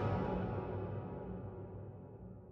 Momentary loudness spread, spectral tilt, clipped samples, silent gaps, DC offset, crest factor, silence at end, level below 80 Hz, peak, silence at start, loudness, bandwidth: 15 LU; -10 dB/octave; under 0.1%; none; under 0.1%; 16 dB; 0 s; -54 dBFS; -26 dBFS; 0 s; -43 LUFS; 5.8 kHz